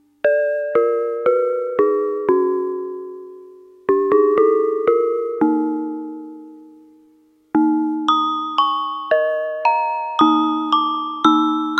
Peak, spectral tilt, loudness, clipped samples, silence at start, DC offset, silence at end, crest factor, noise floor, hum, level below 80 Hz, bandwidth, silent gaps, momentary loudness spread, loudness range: 0 dBFS; -5 dB/octave; -18 LUFS; under 0.1%; 0.25 s; under 0.1%; 0 s; 18 dB; -55 dBFS; none; -70 dBFS; 6.4 kHz; none; 12 LU; 3 LU